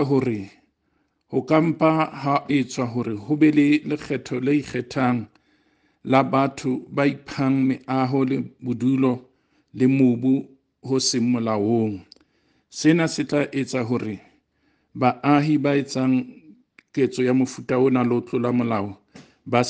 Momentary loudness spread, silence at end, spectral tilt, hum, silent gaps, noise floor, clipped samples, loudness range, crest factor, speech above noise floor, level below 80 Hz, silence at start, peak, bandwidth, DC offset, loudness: 10 LU; 0 s; -6 dB/octave; none; none; -69 dBFS; under 0.1%; 2 LU; 18 dB; 48 dB; -64 dBFS; 0 s; -4 dBFS; 9.6 kHz; under 0.1%; -22 LUFS